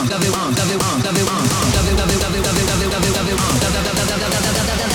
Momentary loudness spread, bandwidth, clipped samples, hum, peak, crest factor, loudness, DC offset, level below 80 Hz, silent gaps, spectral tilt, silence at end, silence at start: 2 LU; over 20 kHz; under 0.1%; none; -2 dBFS; 14 dB; -17 LUFS; under 0.1%; -28 dBFS; none; -4 dB/octave; 0 s; 0 s